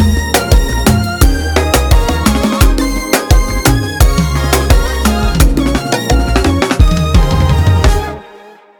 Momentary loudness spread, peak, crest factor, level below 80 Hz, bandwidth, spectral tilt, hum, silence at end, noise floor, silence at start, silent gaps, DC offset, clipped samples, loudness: 3 LU; 0 dBFS; 10 dB; -14 dBFS; 20 kHz; -5 dB/octave; none; 0.3 s; -37 dBFS; 0 s; none; under 0.1%; under 0.1%; -12 LUFS